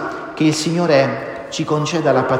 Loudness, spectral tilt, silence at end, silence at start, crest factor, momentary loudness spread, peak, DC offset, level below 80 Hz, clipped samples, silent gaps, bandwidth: -18 LUFS; -5.5 dB/octave; 0 s; 0 s; 16 dB; 11 LU; -2 dBFS; under 0.1%; -54 dBFS; under 0.1%; none; 16 kHz